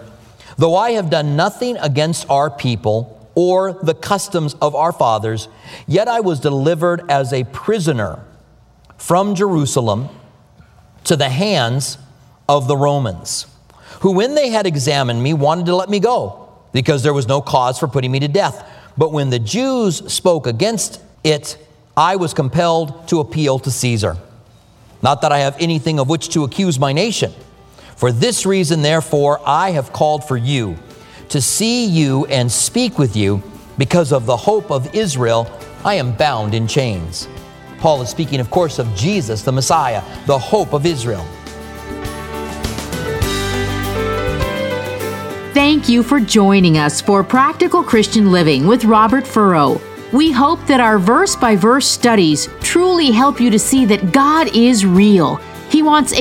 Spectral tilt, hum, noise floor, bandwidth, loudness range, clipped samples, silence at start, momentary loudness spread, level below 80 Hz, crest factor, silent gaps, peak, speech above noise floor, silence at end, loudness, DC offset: -5 dB/octave; none; -48 dBFS; 17 kHz; 6 LU; under 0.1%; 0 s; 11 LU; -40 dBFS; 14 dB; none; 0 dBFS; 33 dB; 0 s; -15 LUFS; under 0.1%